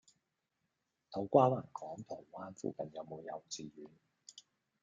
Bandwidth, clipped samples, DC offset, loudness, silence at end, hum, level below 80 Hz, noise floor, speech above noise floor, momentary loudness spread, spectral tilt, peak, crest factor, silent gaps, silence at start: 9.4 kHz; under 0.1%; under 0.1%; -37 LUFS; 0.4 s; none; -80 dBFS; -86 dBFS; 48 dB; 27 LU; -6.5 dB/octave; -12 dBFS; 26 dB; none; 1.1 s